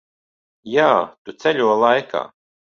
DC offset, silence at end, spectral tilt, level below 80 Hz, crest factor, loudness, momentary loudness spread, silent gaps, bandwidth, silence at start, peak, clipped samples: under 0.1%; 0.45 s; -5 dB/octave; -66 dBFS; 18 dB; -18 LUFS; 12 LU; 1.18-1.25 s; 7.2 kHz; 0.65 s; -2 dBFS; under 0.1%